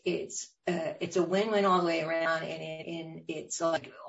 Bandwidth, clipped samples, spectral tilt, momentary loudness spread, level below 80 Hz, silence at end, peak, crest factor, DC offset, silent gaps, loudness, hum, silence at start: 8 kHz; under 0.1%; -4.5 dB/octave; 13 LU; -76 dBFS; 0 s; -14 dBFS; 16 dB; under 0.1%; none; -31 LUFS; none; 0.05 s